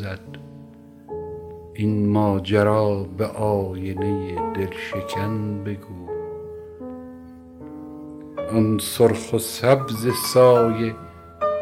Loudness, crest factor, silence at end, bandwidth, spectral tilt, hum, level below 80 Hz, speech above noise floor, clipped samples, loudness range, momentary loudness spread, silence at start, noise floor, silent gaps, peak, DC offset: -22 LUFS; 20 dB; 0 s; 16.5 kHz; -6 dB/octave; none; -52 dBFS; 23 dB; under 0.1%; 11 LU; 20 LU; 0 s; -44 dBFS; none; -2 dBFS; under 0.1%